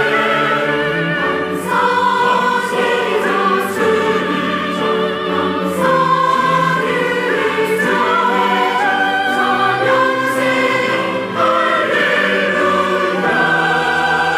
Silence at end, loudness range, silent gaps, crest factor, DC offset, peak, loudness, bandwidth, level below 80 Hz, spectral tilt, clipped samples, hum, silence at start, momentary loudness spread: 0 s; 1 LU; none; 12 dB; under 0.1%; -4 dBFS; -15 LUFS; 16 kHz; -58 dBFS; -4.5 dB/octave; under 0.1%; none; 0 s; 4 LU